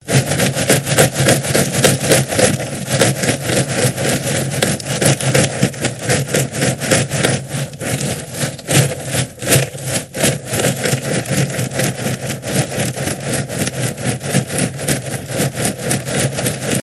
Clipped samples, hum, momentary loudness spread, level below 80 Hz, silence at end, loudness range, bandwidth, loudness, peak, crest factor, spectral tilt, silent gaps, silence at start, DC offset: under 0.1%; none; 7 LU; -46 dBFS; 0 s; 5 LU; 16 kHz; -16 LUFS; 0 dBFS; 16 dB; -4 dB/octave; none; 0.05 s; under 0.1%